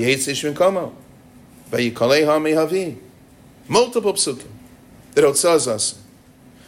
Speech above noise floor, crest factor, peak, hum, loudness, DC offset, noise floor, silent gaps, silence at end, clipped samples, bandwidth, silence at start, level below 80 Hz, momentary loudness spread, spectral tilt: 29 dB; 16 dB; -4 dBFS; none; -18 LUFS; under 0.1%; -48 dBFS; none; 0.7 s; under 0.1%; 16 kHz; 0 s; -58 dBFS; 11 LU; -3.5 dB/octave